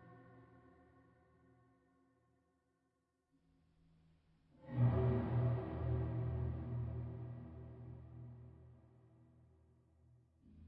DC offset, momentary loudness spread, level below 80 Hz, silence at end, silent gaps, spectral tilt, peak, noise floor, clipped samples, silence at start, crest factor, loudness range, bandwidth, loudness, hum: under 0.1%; 23 LU; -60 dBFS; 0 s; none; -10 dB/octave; -24 dBFS; -84 dBFS; under 0.1%; 0 s; 20 dB; 16 LU; 4 kHz; -40 LUFS; none